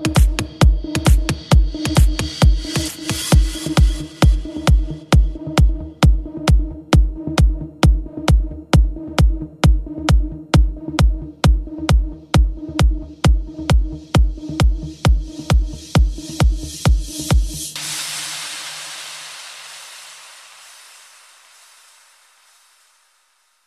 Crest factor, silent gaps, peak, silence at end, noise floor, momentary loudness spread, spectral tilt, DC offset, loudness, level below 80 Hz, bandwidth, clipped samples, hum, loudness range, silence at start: 16 dB; none; 0 dBFS; 3.5 s; -61 dBFS; 9 LU; -5.5 dB/octave; under 0.1%; -18 LUFS; -18 dBFS; 14 kHz; under 0.1%; none; 10 LU; 0 s